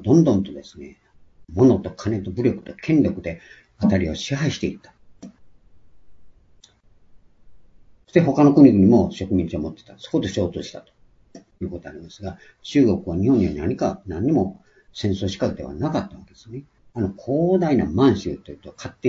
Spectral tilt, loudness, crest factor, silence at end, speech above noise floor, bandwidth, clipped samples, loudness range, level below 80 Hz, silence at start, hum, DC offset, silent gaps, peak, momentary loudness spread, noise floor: -7.5 dB/octave; -20 LUFS; 20 dB; 0 s; 33 dB; 7.6 kHz; under 0.1%; 10 LU; -50 dBFS; 0 s; none; under 0.1%; none; -2 dBFS; 21 LU; -53 dBFS